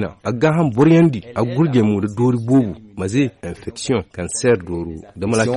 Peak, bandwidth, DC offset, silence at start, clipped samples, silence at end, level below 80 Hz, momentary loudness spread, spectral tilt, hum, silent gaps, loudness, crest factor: -4 dBFS; 11 kHz; under 0.1%; 0 s; under 0.1%; 0 s; -46 dBFS; 13 LU; -6.5 dB/octave; none; none; -18 LUFS; 12 dB